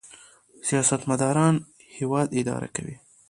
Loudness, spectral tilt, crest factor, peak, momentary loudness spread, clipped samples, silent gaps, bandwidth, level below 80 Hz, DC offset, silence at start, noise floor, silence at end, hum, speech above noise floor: -25 LUFS; -5 dB/octave; 18 dB; -8 dBFS; 12 LU; under 0.1%; none; 11.5 kHz; -60 dBFS; under 0.1%; 0.05 s; -52 dBFS; 0.35 s; none; 28 dB